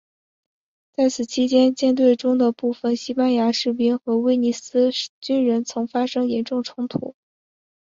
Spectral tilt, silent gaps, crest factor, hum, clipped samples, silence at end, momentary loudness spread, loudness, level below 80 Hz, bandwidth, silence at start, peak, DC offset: -4.5 dB/octave; 5.09-5.21 s; 16 dB; none; under 0.1%; 0.7 s; 9 LU; -21 LUFS; -66 dBFS; 7.6 kHz; 1 s; -6 dBFS; under 0.1%